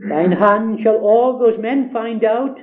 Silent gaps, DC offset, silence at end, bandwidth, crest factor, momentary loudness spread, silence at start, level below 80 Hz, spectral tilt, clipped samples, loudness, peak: none; under 0.1%; 0 s; 4 kHz; 16 dB; 6 LU; 0 s; -66 dBFS; -10 dB/octave; under 0.1%; -15 LUFS; 0 dBFS